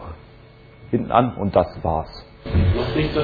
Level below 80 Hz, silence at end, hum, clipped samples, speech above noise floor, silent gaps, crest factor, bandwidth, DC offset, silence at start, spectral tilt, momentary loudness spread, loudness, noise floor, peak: -32 dBFS; 0 s; none; under 0.1%; 26 dB; none; 20 dB; 4.9 kHz; under 0.1%; 0 s; -9.5 dB/octave; 18 LU; -21 LUFS; -46 dBFS; -2 dBFS